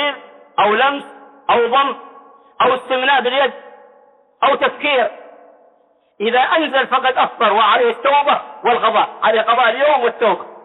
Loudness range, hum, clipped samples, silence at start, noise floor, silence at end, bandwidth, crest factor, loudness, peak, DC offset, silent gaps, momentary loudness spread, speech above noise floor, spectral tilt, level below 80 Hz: 4 LU; none; under 0.1%; 0 s; -56 dBFS; 0.05 s; 4.1 kHz; 14 dB; -15 LUFS; -4 dBFS; under 0.1%; none; 7 LU; 41 dB; -5 dB/octave; -66 dBFS